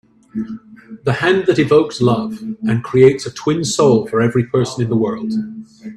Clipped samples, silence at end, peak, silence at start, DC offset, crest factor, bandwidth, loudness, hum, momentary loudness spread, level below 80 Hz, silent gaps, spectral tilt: under 0.1%; 0 s; 0 dBFS; 0.35 s; under 0.1%; 16 dB; 12 kHz; -16 LUFS; none; 14 LU; -52 dBFS; none; -6 dB/octave